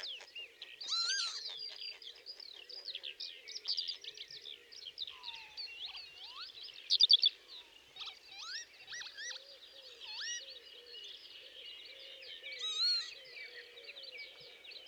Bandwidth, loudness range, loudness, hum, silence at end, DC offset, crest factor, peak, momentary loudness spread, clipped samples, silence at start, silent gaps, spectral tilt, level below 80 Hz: over 20 kHz; 13 LU; -36 LUFS; none; 0 s; under 0.1%; 26 dB; -14 dBFS; 18 LU; under 0.1%; 0 s; none; 3 dB/octave; -86 dBFS